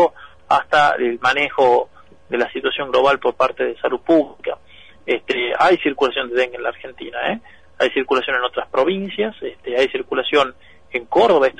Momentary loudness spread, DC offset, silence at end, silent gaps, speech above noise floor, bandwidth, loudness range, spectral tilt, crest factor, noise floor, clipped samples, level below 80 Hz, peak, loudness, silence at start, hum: 12 LU; 0.5%; 0.1 s; none; 29 dB; 10 kHz; 3 LU; -4.5 dB/octave; 14 dB; -47 dBFS; under 0.1%; -54 dBFS; -4 dBFS; -18 LUFS; 0 s; none